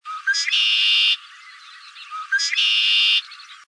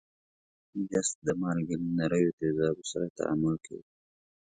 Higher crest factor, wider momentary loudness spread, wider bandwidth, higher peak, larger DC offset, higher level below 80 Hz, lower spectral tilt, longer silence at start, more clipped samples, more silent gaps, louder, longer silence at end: second, 12 dB vs 18 dB; first, 13 LU vs 10 LU; about the same, 10.5 kHz vs 9.6 kHz; first, -8 dBFS vs -14 dBFS; neither; second, under -90 dBFS vs -62 dBFS; second, 12 dB/octave vs -5.5 dB/octave; second, 0.05 s vs 0.75 s; neither; second, none vs 1.15-1.22 s, 2.33-2.38 s, 3.10-3.15 s; first, -17 LUFS vs -31 LUFS; second, 0.15 s vs 0.6 s